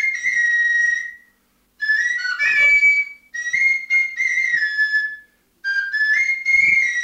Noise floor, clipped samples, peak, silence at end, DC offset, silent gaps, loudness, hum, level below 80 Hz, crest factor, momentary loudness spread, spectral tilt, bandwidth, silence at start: -62 dBFS; under 0.1%; -8 dBFS; 0 s; under 0.1%; none; -16 LUFS; none; -58 dBFS; 12 dB; 11 LU; 1.5 dB/octave; 15.5 kHz; 0 s